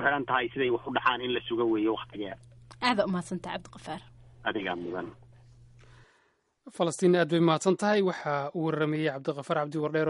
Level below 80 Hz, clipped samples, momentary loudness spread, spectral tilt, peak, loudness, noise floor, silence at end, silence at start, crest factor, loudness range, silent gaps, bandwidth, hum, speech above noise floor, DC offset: -64 dBFS; under 0.1%; 15 LU; -5.5 dB/octave; -10 dBFS; -29 LUFS; -70 dBFS; 0 s; 0 s; 20 dB; 10 LU; none; 11.5 kHz; none; 41 dB; under 0.1%